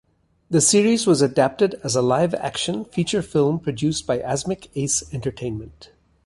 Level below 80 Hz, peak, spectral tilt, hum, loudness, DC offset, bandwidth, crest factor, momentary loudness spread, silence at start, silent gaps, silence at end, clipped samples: -50 dBFS; -4 dBFS; -4.5 dB/octave; none; -21 LUFS; under 0.1%; 11.5 kHz; 18 dB; 11 LU; 0.5 s; none; 0.4 s; under 0.1%